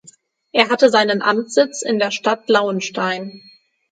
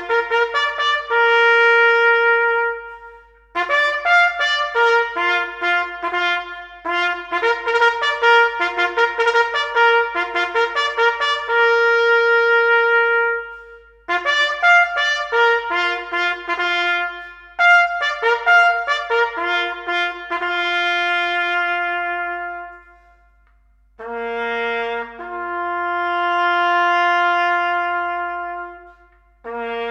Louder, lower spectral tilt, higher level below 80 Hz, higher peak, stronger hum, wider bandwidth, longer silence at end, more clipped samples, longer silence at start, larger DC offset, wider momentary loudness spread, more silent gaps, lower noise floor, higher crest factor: about the same, -17 LUFS vs -17 LUFS; first, -3.5 dB/octave vs -1.5 dB/octave; second, -70 dBFS vs -54 dBFS; about the same, 0 dBFS vs -2 dBFS; neither; about the same, 9.4 kHz vs 8.8 kHz; first, 0.55 s vs 0 s; neither; first, 0.55 s vs 0 s; neither; second, 8 LU vs 13 LU; neither; second, -50 dBFS vs -55 dBFS; about the same, 18 dB vs 16 dB